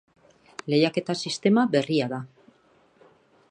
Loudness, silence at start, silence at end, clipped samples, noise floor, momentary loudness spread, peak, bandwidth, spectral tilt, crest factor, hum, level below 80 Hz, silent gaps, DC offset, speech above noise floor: -24 LUFS; 0.65 s; 1.25 s; under 0.1%; -61 dBFS; 18 LU; -8 dBFS; 10.5 kHz; -5.5 dB/octave; 20 dB; none; -72 dBFS; none; under 0.1%; 38 dB